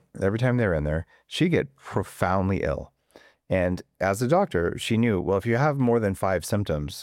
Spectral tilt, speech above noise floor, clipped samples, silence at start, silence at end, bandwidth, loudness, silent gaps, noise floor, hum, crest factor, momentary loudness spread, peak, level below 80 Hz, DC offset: -6.5 dB/octave; 31 dB; under 0.1%; 0.15 s; 0 s; 16.5 kHz; -25 LUFS; none; -56 dBFS; none; 16 dB; 7 LU; -8 dBFS; -44 dBFS; under 0.1%